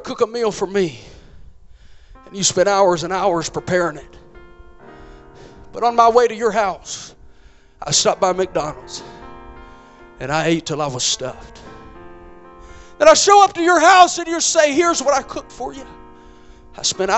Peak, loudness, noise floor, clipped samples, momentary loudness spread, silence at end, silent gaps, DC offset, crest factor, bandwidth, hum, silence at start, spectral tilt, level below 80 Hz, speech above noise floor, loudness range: 0 dBFS; -16 LUFS; -46 dBFS; under 0.1%; 21 LU; 0 s; none; under 0.1%; 18 dB; 8.6 kHz; none; 0 s; -2.5 dB/octave; -46 dBFS; 30 dB; 10 LU